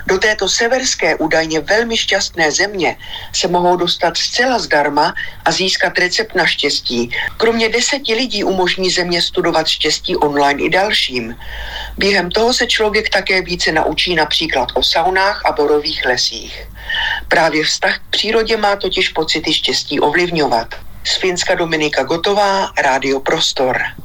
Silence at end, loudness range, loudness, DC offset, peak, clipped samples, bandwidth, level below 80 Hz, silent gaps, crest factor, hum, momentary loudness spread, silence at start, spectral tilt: 0 s; 1 LU; -14 LUFS; under 0.1%; -2 dBFS; under 0.1%; 19 kHz; -38 dBFS; none; 14 dB; none; 5 LU; 0 s; -2.5 dB/octave